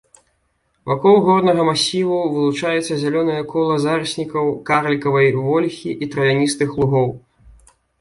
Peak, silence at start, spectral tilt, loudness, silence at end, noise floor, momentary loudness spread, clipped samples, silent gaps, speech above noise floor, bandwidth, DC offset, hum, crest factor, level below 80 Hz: -2 dBFS; 0.85 s; -5.5 dB/octave; -17 LUFS; 0.8 s; -66 dBFS; 9 LU; under 0.1%; none; 49 dB; 11.5 kHz; under 0.1%; none; 16 dB; -52 dBFS